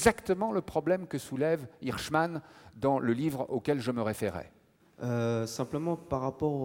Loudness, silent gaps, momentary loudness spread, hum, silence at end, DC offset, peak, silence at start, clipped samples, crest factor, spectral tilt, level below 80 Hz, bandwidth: -32 LUFS; none; 7 LU; none; 0 s; under 0.1%; -10 dBFS; 0 s; under 0.1%; 20 dB; -6 dB/octave; -58 dBFS; 17 kHz